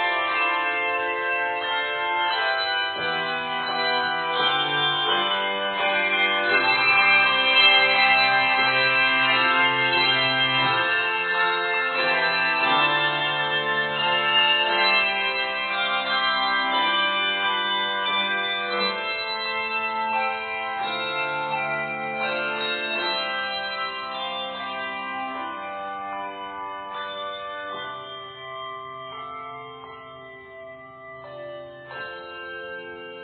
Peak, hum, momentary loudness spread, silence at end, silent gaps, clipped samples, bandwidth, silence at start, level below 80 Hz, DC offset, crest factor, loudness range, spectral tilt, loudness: -6 dBFS; none; 18 LU; 0 s; none; under 0.1%; 4.7 kHz; 0 s; -66 dBFS; under 0.1%; 18 dB; 17 LU; -6 dB/octave; -21 LUFS